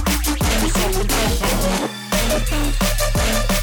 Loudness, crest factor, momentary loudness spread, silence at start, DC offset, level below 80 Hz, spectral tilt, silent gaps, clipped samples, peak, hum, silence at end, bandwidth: -19 LUFS; 10 dB; 3 LU; 0 s; under 0.1%; -22 dBFS; -3.5 dB/octave; none; under 0.1%; -8 dBFS; none; 0 s; over 20 kHz